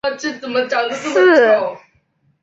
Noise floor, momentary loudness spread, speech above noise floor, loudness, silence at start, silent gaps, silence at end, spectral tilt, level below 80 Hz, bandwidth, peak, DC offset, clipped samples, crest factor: -61 dBFS; 12 LU; 45 dB; -15 LUFS; 0.05 s; none; 0.65 s; -3.5 dB/octave; -64 dBFS; 8 kHz; -2 dBFS; under 0.1%; under 0.1%; 14 dB